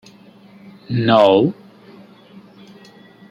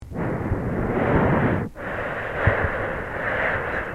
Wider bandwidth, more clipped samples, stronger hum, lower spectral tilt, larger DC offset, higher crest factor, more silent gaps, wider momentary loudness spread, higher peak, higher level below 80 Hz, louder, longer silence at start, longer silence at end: second, 9.4 kHz vs 13.5 kHz; neither; neither; about the same, -7.5 dB/octave vs -8.5 dB/octave; second, under 0.1% vs 0.3%; about the same, 18 dB vs 18 dB; neither; first, 14 LU vs 8 LU; first, -2 dBFS vs -6 dBFS; second, -60 dBFS vs -36 dBFS; first, -15 LUFS vs -24 LUFS; first, 0.9 s vs 0 s; first, 1.8 s vs 0 s